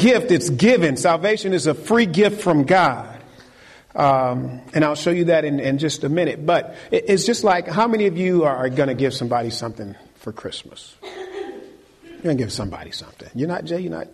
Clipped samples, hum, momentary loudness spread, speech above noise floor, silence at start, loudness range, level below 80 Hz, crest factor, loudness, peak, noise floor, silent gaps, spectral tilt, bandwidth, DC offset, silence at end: under 0.1%; none; 17 LU; 28 dB; 0 s; 11 LU; -54 dBFS; 14 dB; -19 LUFS; -6 dBFS; -47 dBFS; none; -5.5 dB/octave; 13 kHz; under 0.1%; 0.1 s